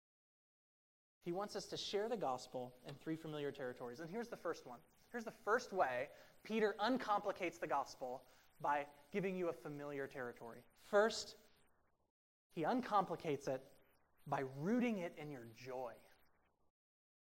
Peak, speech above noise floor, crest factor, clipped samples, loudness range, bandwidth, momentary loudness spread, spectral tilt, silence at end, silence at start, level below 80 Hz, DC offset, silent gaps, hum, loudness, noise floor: -22 dBFS; 33 dB; 22 dB; under 0.1%; 5 LU; 16 kHz; 14 LU; -5 dB/octave; 1.25 s; 1.25 s; -80 dBFS; under 0.1%; 12.10-12.50 s; none; -43 LUFS; -76 dBFS